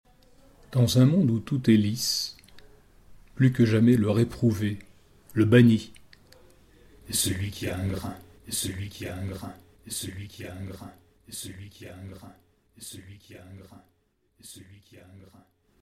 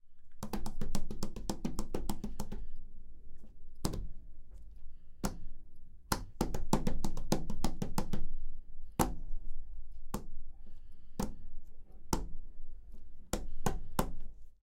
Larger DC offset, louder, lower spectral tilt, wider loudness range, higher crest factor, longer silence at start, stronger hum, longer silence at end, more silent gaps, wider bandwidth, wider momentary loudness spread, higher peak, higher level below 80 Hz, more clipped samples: neither; first, -25 LUFS vs -41 LUFS; about the same, -5.5 dB/octave vs -5 dB/octave; first, 23 LU vs 8 LU; about the same, 20 dB vs 22 dB; first, 0.7 s vs 0.05 s; neither; first, 0.6 s vs 0.1 s; neither; about the same, 16 kHz vs 16.5 kHz; first, 25 LU vs 22 LU; first, -6 dBFS vs -10 dBFS; second, -54 dBFS vs -38 dBFS; neither